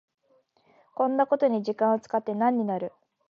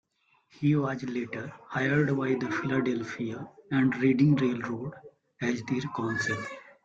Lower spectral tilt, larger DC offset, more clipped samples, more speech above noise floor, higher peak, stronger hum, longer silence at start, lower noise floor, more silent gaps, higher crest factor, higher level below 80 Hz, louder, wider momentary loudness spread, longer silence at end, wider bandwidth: about the same, -8 dB/octave vs -7 dB/octave; neither; neither; about the same, 41 dB vs 40 dB; about the same, -10 dBFS vs -12 dBFS; neither; first, 1 s vs 0.6 s; about the same, -66 dBFS vs -68 dBFS; neither; about the same, 16 dB vs 16 dB; second, -82 dBFS vs -66 dBFS; first, -26 LUFS vs -29 LUFS; second, 9 LU vs 12 LU; first, 0.4 s vs 0.15 s; second, 7 kHz vs 7.8 kHz